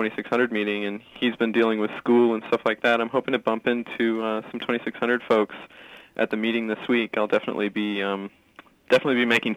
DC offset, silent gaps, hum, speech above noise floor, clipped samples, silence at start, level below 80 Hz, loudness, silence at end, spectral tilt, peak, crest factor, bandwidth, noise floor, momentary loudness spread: under 0.1%; none; none; 29 dB; under 0.1%; 0 s; -70 dBFS; -24 LUFS; 0 s; -5.5 dB/octave; -6 dBFS; 18 dB; 12.5 kHz; -52 dBFS; 8 LU